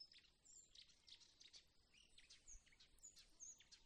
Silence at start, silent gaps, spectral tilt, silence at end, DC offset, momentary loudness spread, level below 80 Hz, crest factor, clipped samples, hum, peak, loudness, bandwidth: 0 s; none; 0.5 dB/octave; 0 s; under 0.1%; 7 LU; -78 dBFS; 18 dB; under 0.1%; none; -50 dBFS; -65 LUFS; 10 kHz